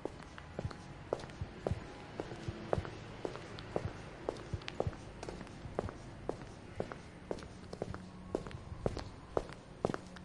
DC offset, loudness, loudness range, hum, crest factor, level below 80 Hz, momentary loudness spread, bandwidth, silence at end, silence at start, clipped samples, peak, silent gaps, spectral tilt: under 0.1%; -44 LUFS; 2 LU; none; 28 dB; -54 dBFS; 8 LU; 11.5 kHz; 0 s; 0 s; under 0.1%; -14 dBFS; none; -6.5 dB/octave